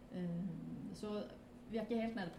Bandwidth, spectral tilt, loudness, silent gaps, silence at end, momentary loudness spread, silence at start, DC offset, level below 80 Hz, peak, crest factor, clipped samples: 12.5 kHz; -7.5 dB/octave; -44 LUFS; none; 0 s; 9 LU; 0 s; under 0.1%; -66 dBFS; -30 dBFS; 14 dB; under 0.1%